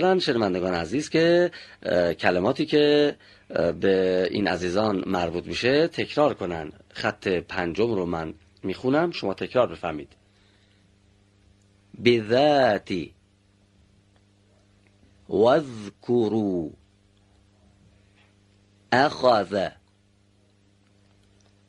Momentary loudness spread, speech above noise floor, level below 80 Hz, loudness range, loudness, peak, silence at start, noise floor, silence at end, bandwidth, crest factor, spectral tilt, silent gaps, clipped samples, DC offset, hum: 12 LU; 39 dB; -58 dBFS; 6 LU; -24 LUFS; -2 dBFS; 0 s; -62 dBFS; 2 s; 11 kHz; 22 dB; -6 dB/octave; none; under 0.1%; under 0.1%; none